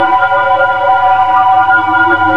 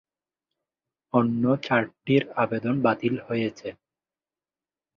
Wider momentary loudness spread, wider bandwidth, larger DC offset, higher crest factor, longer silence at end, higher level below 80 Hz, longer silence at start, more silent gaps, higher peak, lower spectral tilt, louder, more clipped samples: second, 2 LU vs 7 LU; second, 6.2 kHz vs 7 kHz; first, 2% vs under 0.1%; second, 10 dB vs 22 dB; second, 0 s vs 1.25 s; first, -46 dBFS vs -64 dBFS; second, 0 s vs 1.15 s; neither; first, 0 dBFS vs -6 dBFS; second, -5.5 dB/octave vs -8 dB/octave; first, -9 LUFS vs -25 LUFS; neither